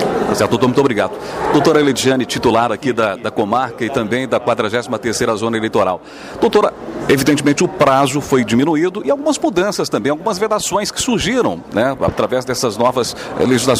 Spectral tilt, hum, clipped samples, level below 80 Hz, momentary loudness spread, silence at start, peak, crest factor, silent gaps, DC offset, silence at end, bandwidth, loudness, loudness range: -4.5 dB/octave; none; under 0.1%; -46 dBFS; 6 LU; 0 s; -2 dBFS; 14 dB; none; under 0.1%; 0 s; 16 kHz; -16 LUFS; 2 LU